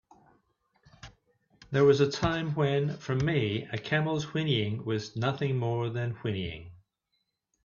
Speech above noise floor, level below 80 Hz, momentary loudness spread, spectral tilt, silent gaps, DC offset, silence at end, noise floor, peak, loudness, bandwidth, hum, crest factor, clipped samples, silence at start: 51 dB; -56 dBFS; 9 LU; -6.5 dB/octave; none; under 0.1%; 0.9 s; -79 dBFS; -12 dBFS; -29 LUFS; 7.2 kHz; none; 18 dB; under 0.1%; 1.05 s